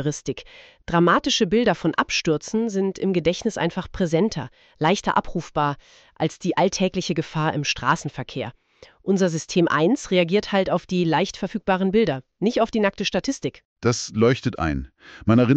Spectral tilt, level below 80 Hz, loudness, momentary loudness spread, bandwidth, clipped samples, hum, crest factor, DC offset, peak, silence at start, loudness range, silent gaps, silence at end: -5 dB/octave; -46 dBFS; -22 LUFS; 11 LU; 8.6 kHz; under 0.1%; none; 18 dB; under 0.1%; -4 dBFS; 0 s; 3 LU; 13.65-13.76 s; 0 s